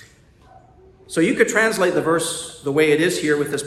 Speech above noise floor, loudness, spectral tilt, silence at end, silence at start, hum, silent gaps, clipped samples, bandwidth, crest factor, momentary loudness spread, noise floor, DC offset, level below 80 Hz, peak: 31 dB; -19 LUFS; -4 dB/octave; 0 s; 1.1 s; none; none; under 0.1%; 13.5 kHz; 18 dB; 8 LU; -50 dBFS; under 0.1%; -56 dBFS; -2 dBFS